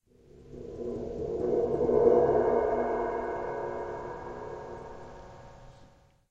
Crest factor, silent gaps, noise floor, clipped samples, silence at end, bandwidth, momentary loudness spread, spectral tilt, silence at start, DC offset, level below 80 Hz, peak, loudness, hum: 22 dB; none; -58 dBFS; under 0.1%; 0.45 s; 7.6 kHz; 23 LU; -8.5 dB/octave; 0.35 s; under 0.1%; -52 dBFS; -10 dBFS; -29 LUFS; none